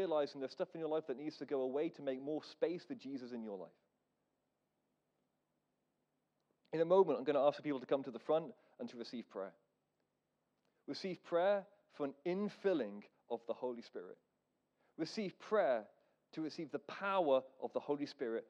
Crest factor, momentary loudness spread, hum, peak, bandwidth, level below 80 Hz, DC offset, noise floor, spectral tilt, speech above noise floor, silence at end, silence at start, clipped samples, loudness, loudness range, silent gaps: 22 dB; 15 LU; 50 Hz at -85 dBFS; -20 dBFS; 8.4 kHz; under -90 dBFS; under 0.1%; -86 dBFS; -6.5 dB/octave; 46 dB; 0.05 s; 0 s; under 0.1%; -40 LUFS; 9 LU; none